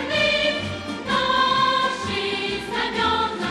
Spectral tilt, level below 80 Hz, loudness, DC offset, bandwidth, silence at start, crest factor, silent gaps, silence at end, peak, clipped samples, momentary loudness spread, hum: -3.5 dB/octave; -48 dBFS; -21 LUFS; under 0.1%; 12.5 kHz; 0 s; 14 dB; none; 0 s; -8 dBFS; under 0.1%; 7 LU; none